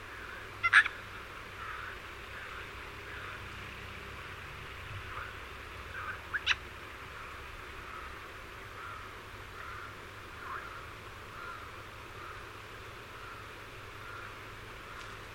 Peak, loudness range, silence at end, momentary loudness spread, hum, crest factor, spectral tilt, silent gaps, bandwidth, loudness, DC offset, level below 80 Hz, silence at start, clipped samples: -10 dBFS; 13 LU; 0 s; 12 LU; none; 30 dB; -3 dB/octave; none; 16.5 kHz; -38 LUFS; under 0.1%; -56 dBFS; 0 s; under 0.1%